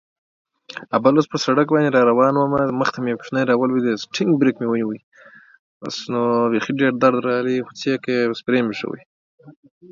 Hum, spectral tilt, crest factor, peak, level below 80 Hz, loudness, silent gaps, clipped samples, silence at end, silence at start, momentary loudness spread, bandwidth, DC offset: none; -6 dB/octave; 18 dB; -2 dBFS; -62 dBFS; -19 LUFS; 5.03-5.12 s, 5.59-5.81 s, 9.06-9.38 s; under 0.1%; 0.4 s; 0.7 s; 12 LU; 7.6 kHz; under 0.1%